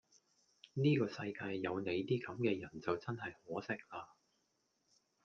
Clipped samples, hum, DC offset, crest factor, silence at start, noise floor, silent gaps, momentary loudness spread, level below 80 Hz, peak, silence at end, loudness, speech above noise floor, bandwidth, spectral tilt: under 0.1%; none; under 0.1%; 20 dB; 0.75 s; -81 dBFS; none; 12 LU; -78 dBFS; -22 dBFS; 1.2 s; -39 LUFS; 42 dB; 7.2 kHz; -7.5 dB/octave